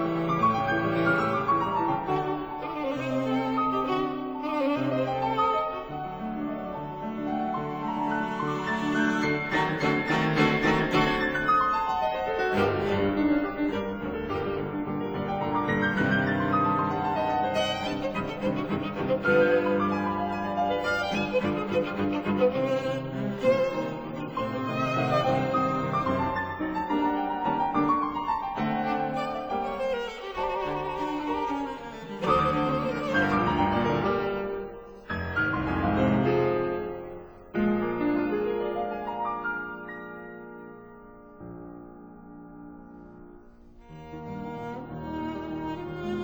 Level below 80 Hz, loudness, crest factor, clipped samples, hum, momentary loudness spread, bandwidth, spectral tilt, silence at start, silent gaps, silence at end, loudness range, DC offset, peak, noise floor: -50 dBFS; -27 LUFS; 18 dB; under 0.1%; none; 13 LU; over 20 kHz; -7 dB/octave; 0 s; none; 0 s; 11 LU; under 0.1%; -10 dBFS; -50 dBFS